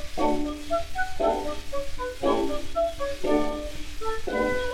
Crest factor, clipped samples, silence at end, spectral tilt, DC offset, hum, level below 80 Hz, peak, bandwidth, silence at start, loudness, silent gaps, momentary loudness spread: 16 dB; under 0.1%; 0 s; -5 dB/octave; under 0.1%; none; -36 dBFS; -10 dBFS; 15 kHz; 0 s; -28 LUFS; none; 8 LU